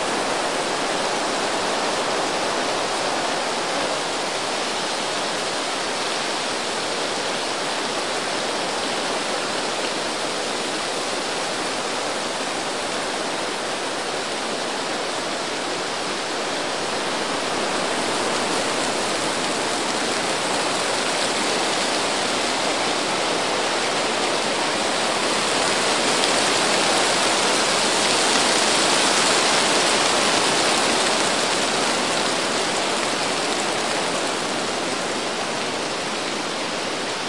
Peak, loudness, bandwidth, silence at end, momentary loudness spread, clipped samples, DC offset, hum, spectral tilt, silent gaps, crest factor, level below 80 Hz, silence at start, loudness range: -2 dBFS; -21 LUFS; 11.5 kHz; 0 s; 7 LU; under 0.1%; 0.5%; none; -1.5 dB/octave; none; 22 dB; -62 dBFS; 0 s; 7 LU